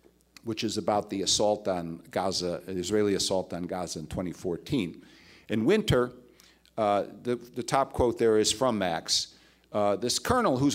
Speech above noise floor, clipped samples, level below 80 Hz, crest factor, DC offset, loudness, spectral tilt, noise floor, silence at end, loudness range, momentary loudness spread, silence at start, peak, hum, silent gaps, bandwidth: 31 dB; under 0.1%; -52 dBFS; 22 dB; under 0.1%; -28 LUFS; -4 dB/octave; -59 dBFS; 0 s; 3 LU; 10 LU; 0.45 s; -8 dBFS; none; none; 16 kHz